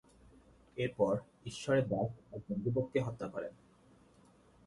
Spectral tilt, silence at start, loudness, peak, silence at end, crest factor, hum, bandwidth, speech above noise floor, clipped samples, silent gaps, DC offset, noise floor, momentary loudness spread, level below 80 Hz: -7 dB/octave; 0.75 s; -36 LUFS; -18 dBFS; 1.15 s; 20 dB; none; 11.5 kHz; 29 dB; under 0.1%; none; under 0.1%; -64 dBFS; 15 LU; -66 dBFS